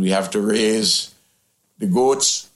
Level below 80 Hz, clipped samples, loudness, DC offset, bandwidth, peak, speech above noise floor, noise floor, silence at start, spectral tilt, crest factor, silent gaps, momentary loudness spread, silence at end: -64 dBFS; under 0.1%; -18 LUFS; under 0.1%; 14.5 kHz; -4 dBFS; 46 dB; -65 dBFS; 0 s; -3.5 dB/octave; 16 dB; none; 7 LU; 0.1 s